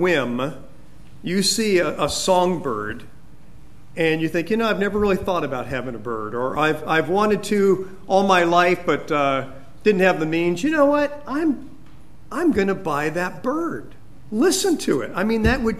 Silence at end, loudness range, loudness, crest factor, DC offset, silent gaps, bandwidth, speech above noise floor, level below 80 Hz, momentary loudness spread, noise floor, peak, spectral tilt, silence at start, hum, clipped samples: 0 s; 4 LU; -21 LUFS; 20 dB; 2%; none; 15 kHz; 27 dB; -42 dBFS; 11 LU; -47 dBFS; -2 dBFS; -4.5 dB/octave; 0 s; none; under 0.1%